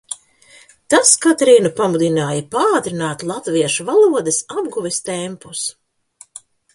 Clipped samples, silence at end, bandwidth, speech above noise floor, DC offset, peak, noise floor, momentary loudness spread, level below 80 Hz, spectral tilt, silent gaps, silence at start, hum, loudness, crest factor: under 0.1%; 0.35 s; 11.5 kHz; 32 dB; under 0.1%; 0 dBFS; -48 dBFS; 13 LU; -62 dBFS; -3.5 dB/octave; none; 0.1 s; none; -16 LUFS; 18 dB